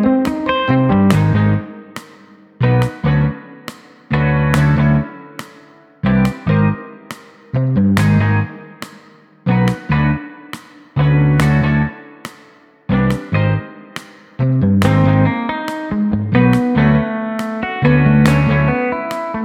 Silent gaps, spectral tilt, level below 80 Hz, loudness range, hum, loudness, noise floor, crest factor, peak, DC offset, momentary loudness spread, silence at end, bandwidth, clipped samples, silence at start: none; -8 dB/octave; -34 dBFS; 4 LU; none; -15 LUFS; -46 dBFS; 16 dB; 0 dBFS; under 0.1%; 20 LU; 0 s; 13.5 kHz; under 0.1%; 0 s